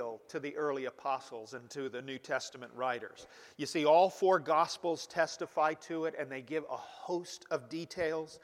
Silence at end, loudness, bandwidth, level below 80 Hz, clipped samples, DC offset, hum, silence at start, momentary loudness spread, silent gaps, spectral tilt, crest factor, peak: 0.05 s; -34 LUFS; 15.5 kHz; -78 dBFS; under 0.1%; under 0.1%; none; 0 s; 15 LU; none; -4 dB/octave; 20 dB; -14 dBFS